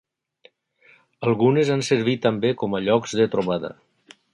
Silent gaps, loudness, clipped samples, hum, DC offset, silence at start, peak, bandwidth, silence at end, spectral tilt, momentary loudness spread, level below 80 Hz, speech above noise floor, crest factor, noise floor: none; -21 LUFS; under 0.1%; none; under 0.1%; 1.2 s; -4 dBFS; 11.5 kHz; 0.6 s; -6 dB/octave; 8 LU; -62 dBFS; 36 dB; 18 dB; -57 dBFS